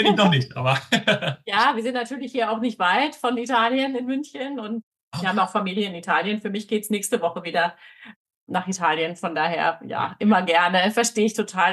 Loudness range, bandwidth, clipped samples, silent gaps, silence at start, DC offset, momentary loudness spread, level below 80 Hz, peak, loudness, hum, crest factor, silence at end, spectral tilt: 4 LU; 12.5 kHz; under 0.1%; 4.83-4.92 s, 5.01-5.11 s, 8.16-8.25 s, 8.36-8.47 s; 0 s; under 0.1%; 10 LU; -70 dBFS; -4 dBFS; -22 LUFS; none; 18 dB; 0 s; -4 dB/octave